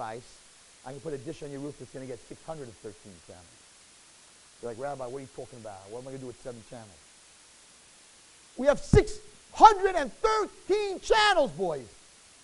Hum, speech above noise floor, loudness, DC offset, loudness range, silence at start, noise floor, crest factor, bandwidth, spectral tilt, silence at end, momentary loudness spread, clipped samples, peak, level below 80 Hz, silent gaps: none; 28 dB; -26 LUFS; under 0.1%; 20 LU; 0 s; -56 dBFS; 26 dB; 11.5 kHz; -4.5 dB/octave; 0.55 s; 24 LU; under 0.1%; -4 dBFS; -46 dBFS; none